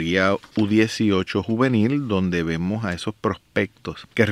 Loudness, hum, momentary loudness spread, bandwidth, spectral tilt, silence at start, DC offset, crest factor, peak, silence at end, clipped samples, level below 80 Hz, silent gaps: -22 LUFS; none; 8 LU; 12.5 kHz; -6.5 dB/octave; 0 s; under 0.1%; 20 dB; -2 dBFS; 0 s; under 0.1%; -50 dBFS; none